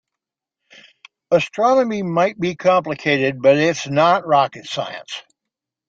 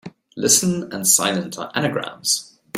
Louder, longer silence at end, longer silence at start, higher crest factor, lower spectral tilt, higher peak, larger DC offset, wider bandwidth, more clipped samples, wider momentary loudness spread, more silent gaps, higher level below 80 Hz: about the same, -18 LUFS vs -19 LUFS; first, 0.7 s vs 0 s; first, 1.3 s vs 0.05 s; about the same, 18 dB vs 20 dB; first, -5 dB/octave vs -2.5 dB/octave; about the same, -2 dBFS vs -2 dBFS; neither; second, 7.8 kHz vs 16 kHz; neither; about the same, 11 LU vs 10 LU; neither; about the same, -62 dBFS vs -60 dBFS